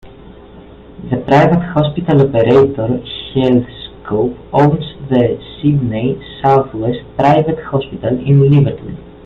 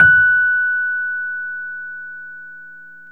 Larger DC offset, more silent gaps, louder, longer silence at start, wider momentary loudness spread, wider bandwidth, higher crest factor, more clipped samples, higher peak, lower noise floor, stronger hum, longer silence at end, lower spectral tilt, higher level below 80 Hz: second, under 0.1% vs 0.4%; neither; about the same, -14 LUFS vs -16 LUFS; about the same, 0.05 s vs 0 s; second, 11 LU vs 24 LU; first, 5.6 kHz vs 3.2 kHz; about the same, 14 dB vs 18 dB; neither; about the same, 0 dBFS vs 0 dBFS; about the same, -37 dBFS vs -39 dBFS; second, none vs 60 Hz at -65 dBFS; first, 0.15 s vs 0 s; first, -9 dB/octave vs -5.5 dB/octave; first, -40 dBFS vs -52 dBFS